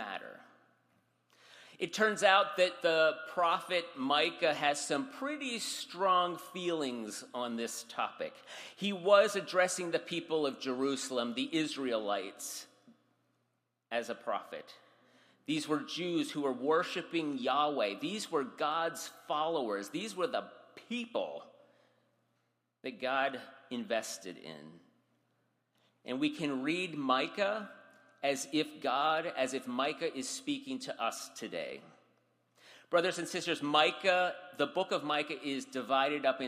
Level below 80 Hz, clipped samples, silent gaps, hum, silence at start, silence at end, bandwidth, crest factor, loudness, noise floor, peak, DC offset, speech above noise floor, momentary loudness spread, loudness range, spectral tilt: -84 dBFS; under 0.1%; none; none; 0 s; 0 s; 15 kHz; 24 dB; -34 LUFS; -81 dBFS; -10 dBFS; under 0.1%; 47 dB; 13 LU; 8 LU; -3 dB/octave